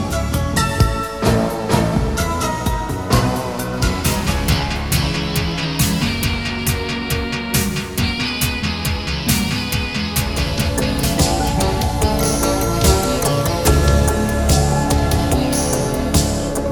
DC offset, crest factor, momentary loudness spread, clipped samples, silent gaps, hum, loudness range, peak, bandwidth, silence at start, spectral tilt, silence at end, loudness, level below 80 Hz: 0.5%; 16 dB; 5 LU; under 0.1%; none; none; 3 LU; 0 dBFS; over 20 kHz; 0 s; -4.5 dB/octave; 0 s; -18 LUFS; -24 dBFS